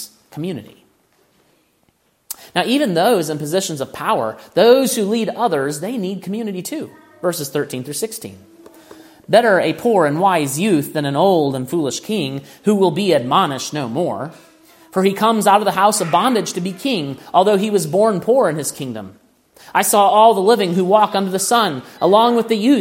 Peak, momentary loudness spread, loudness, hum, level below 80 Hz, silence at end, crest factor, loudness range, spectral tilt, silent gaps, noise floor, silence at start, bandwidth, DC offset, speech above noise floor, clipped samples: 0 dBFS; 13 LU; -17 LUFS; none; -66 dBFS; 0 s; 18 dB; 6 LU; -4.5 dB/octave; none; -61 dBFS; 0 s; 16.5 kHz; under 0.1%; 45 dB; under 0.1%